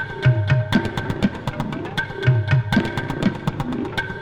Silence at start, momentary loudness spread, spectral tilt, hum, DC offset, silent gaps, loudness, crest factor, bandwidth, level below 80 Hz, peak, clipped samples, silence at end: 0 s; 7 LU; -7 dB/octave; none; under 0.1%; none; -22 LUFS; 16 dB; 11 kHz; -40 dBFS; -6 dBFS; under 0.1%; 0 s